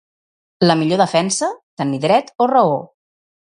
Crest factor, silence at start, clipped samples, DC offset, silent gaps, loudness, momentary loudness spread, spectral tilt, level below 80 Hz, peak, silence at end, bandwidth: 18 dB; 0.6 s; under 0.1%; under 0.1%; 1.63-1.77 s; -17 LUFS; 9 LU; -5 dB/octave; -64 dBFS; 0 dBFS; 0.65 s; 11 kHz